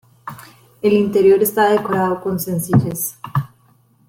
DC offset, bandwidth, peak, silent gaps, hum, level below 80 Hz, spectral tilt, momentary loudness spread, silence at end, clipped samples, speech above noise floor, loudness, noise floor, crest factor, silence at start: under 0.1%; 17 kHz; -2 dBFS; none; none; -52 dBFS; -6 dB/octave; 20 LU; 0.65 s; under 0.1%; 39 dB; -17 LUFS; -55 dBFS; 16 dB; 0.25 s